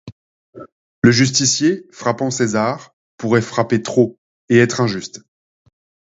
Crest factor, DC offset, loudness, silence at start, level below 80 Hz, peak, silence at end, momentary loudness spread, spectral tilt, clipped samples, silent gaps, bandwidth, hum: 18 dB; under 0.1%; -17 LUFS; 0.05 s; -56 dBFS; 0 dBFS; 0.95 s; 9 LU; -4.5 dB/octave; under 0.1%; 0.12-0.53 s, 0.72-1.02 s, 2.93-3.18 s, 4.18-4.48 s; 8 kHz; none